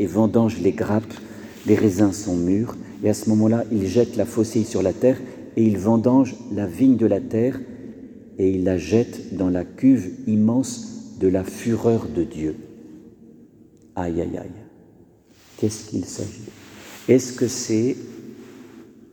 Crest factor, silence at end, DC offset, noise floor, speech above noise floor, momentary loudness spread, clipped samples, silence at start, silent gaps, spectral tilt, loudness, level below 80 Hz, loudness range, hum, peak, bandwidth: 18 dB; 0.3 s; under 0.1%; -52 dBFS; 32 dB; 19 LU; under 0.1%; 0 s; none; -7 dB/octave; -21 LUFS; -52 dBFS; 10 LU; none; -4 dBFS; 19.5 kHz